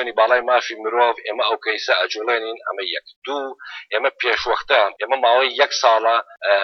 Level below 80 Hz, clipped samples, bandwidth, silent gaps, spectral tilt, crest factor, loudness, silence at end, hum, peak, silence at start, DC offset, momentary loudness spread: -60 dBFS; under 0.1%; 6.4 kHz; 3.16-3.22 s; 0 dB/octave; 18 dB; -19 LUFS; 0 s; none; -2 dBFS; 0 s; under 0.1%; 11 LU